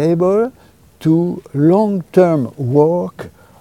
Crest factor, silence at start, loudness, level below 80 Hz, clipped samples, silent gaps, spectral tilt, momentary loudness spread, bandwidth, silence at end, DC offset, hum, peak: 14 dB; 0 s; -15 LUFS; -54 dBFS; under 0.1%; none; -9.5 dB/octave; 10 LU; 15 kHz; 0.35 s; 0.1%; none; 0 dBFS